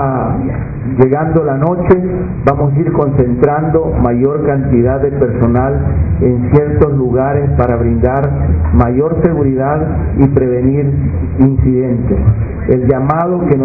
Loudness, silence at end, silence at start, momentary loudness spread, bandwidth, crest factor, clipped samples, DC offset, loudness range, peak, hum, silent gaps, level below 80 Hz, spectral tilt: -12 LUFS; 0 s; 0 s; 4 LU; 2.7 kHz; 12 dB; 0.3%; under 0.1%; 1 LU; 0 dBFS; none; none; -22 dBFS; -13 dB/octave